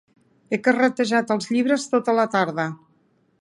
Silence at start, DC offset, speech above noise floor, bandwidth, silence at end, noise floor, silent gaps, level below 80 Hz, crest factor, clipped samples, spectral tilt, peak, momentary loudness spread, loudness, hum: 0.5 s; under 0.1%; 42 dB; 11.5 kHz; 0.65 s; -63 dBFS; none; -72 dBFS; 18 dB; under 0.1%; -5 dB/octave; -4 dBFS; 9 LU; -21 LUFS; none